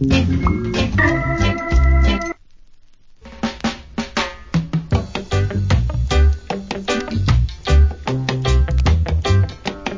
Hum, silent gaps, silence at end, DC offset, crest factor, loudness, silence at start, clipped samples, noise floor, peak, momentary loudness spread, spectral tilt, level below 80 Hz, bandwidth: none; none; 0 s; under 0.1%; 16 dB; -19 LUFS; 0 s; under 0.1%; -43 dBFS; -2 dBFS; 9 LU; -6 dB/octave; -20 dBFS; 7.6 kHz